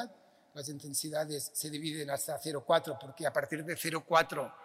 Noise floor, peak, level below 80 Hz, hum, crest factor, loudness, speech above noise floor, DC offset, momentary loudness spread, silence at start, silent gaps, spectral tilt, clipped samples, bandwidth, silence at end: -55 dBFS; -14 dBFS; -78 dBFS; none; 20 dB; -34 LUFS; 20 dB; under 0.1%; 14 LU; 0 s; none; -3 dB/octave; under 0.1%; 16 kHz; 0 s